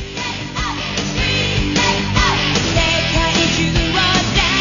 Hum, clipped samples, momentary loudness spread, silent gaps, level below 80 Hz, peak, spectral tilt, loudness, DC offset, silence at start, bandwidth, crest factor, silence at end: none; under 0.1%; 8 LU; none; -26 dBFS; 0 dBFS; -3.5 dB/octave; -16 LUFS; under 0.1%; 0 s; 7.4 kHz; 16 dB; 0 s